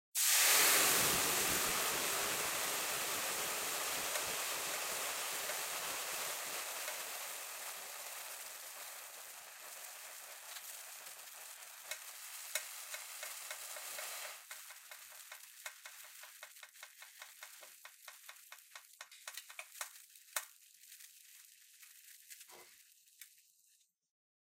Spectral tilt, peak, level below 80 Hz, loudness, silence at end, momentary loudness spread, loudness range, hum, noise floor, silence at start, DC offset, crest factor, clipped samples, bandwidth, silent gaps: 0.5 dB/octave; -16 dBFS; -74 dBFS; -36 LUFS; 1.15 s; 23 LU; 18 LU; none; -74 dBFS; 0.15 s; under 0.1%; 24 dB; under 0.1%; 16 kHz; none